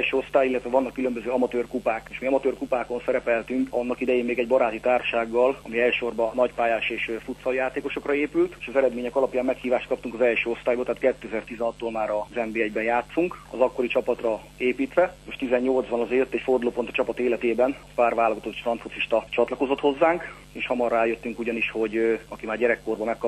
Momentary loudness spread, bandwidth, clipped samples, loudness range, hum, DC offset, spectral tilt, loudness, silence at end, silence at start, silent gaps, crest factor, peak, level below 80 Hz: 6 LU; 12.5 kHz; under 0.1%; 2 LU; none; under 0.1%; -5.5 dB/octave; -25 LUFS; 0 s; 0 s; none; 18 dB; -6 dBFS; -52 dBFS